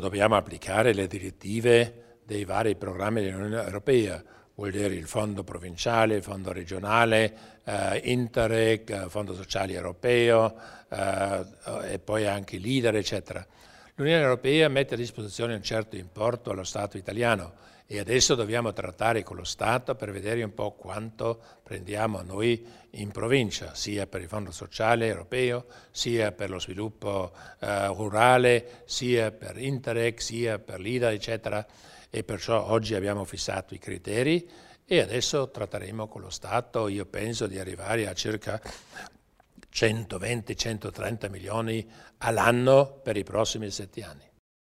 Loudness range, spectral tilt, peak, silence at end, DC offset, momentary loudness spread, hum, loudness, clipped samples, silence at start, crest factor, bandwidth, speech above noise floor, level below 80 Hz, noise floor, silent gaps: 5 LU; -4.5 dB/octave; -4 dBFS; 0.55 s; under 0.1%; 14 LU; none; -28 LUFS; under 0.1%; 0 s; 24 dB; 15.5 kHz; 29 dB; -54 dBFS; -57 dBFS; none